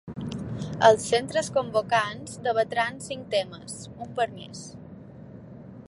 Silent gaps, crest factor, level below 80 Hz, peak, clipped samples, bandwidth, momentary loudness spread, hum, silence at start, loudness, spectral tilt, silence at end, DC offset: none; 24 dB; -58 dBFS; -4 dBFS; under 0.1%; 11.5 kHz; 24 LU; none; 0.05 s; -26 LUFS; -4 dB/octave; 0.05 s; under 0.1%